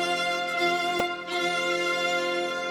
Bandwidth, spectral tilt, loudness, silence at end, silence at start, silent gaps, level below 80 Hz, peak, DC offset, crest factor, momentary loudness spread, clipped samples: 16 kHz; -2.5 dB/octave; -26 LUFS; 0 s; 0 s; none; -66 dBFS; -12 dBFS; under 0.1%; 14 dB; 3 LU; under 0.1%